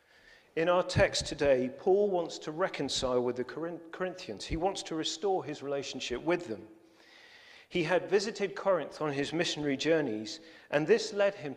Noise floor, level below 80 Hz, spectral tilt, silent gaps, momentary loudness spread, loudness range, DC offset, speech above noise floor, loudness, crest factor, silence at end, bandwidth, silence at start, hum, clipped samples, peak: -60 dBFS; -56 dBFS; -4.5 dB/octave; none; 10 LU; 5 LU; under 0.1%; 29 dB; -31 LUFS; 20 dB; 0 s; 11.5 kHz; 0.55 s; none; under 0.1%; -12 dBFS